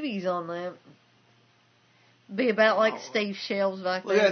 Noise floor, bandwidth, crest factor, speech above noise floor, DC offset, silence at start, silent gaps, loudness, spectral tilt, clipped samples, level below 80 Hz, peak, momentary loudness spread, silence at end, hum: -63 dBFS; 6.6 kHz; 20 dB; 37 dB; under 0.1%; 0 s; none; -26 LUFS; -5 dB/octave; under 0.1%; -82 dBFS; -8 dBFS; 14 LU; 0 s; none